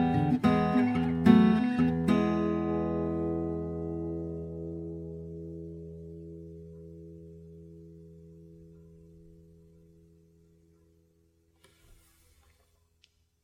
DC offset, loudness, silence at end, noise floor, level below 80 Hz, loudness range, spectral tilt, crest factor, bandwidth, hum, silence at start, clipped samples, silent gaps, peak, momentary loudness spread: under 0.1%; -28 LUFS; 4.8 s; -69 dBFS; -52 dBFS; 25 LU; -8.5 dB/octave; 24 dB; 10 kHz; none; 0 s; under 0.1%; none; -6 dBFS; 25 LU